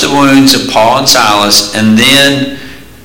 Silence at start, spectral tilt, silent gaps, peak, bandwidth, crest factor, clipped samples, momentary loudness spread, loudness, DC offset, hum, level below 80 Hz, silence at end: 0 s; -3 dB/octave; none; 0 dBFS; over 20 kHz; 8 dB; 0.8%; 7 LU; -6 LUFS; under 0.1%; none; -38 dBFS; 0.2 s